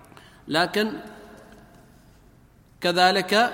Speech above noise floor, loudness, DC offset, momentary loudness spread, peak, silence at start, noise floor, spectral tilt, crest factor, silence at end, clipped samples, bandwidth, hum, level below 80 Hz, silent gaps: 33 dB; -22 LUFS; under 0.1%; 25 LU; -4 dBFS; 0.45 s; -54 dBFS; -3.5 dB/octave; 22 dB; 0 s; under 0.1%; 16.5 kHz; none; -60 dBFS; none